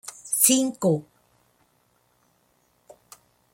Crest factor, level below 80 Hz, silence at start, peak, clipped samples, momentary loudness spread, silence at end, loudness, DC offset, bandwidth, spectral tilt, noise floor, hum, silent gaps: 26 dB; -72 dBFS; 0.05 s; -2 dBFS; under 0.1%; 10 LU; 2.5 s; -21 LUFS; under 0.1%; 16.5 kHz; -3.5 dB/octave; -66 dBFS; none; none